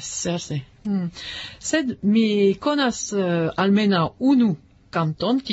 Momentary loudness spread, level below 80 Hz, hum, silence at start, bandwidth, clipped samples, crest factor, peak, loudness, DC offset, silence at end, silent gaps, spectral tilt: 11 LU; -56 dBFS; none; 0 s; 8 kHz; under 0.1%; 14 dB; -8 dBFS; -22 LUFS; under 0.1%; 0 s; none; -5 dB/octave